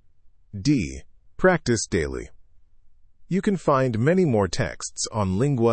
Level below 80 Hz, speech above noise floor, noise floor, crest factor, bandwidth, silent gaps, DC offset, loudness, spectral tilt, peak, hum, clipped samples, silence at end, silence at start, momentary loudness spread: -44 dBFS; 30 dB; -51 dBFS; 18 dB; 8.8 kHz; none; under 0.1%; -23 LUFS; -5.5 dB/octave; -4 dBFS; none; under 0.1%; 0 s; 0.25 s; 12 LU